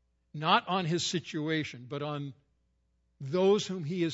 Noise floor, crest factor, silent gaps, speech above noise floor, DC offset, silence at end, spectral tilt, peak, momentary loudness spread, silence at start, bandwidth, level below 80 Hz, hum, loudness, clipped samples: -74 dBFS; 22 dB; none; 43 dB; under 0.1%; 0 s; -5 dB/octave; -10 dBFS; 13 LU; 0.35 s; 8 kHz; -72 dBFS; none; -31 LUFS; under 0.1%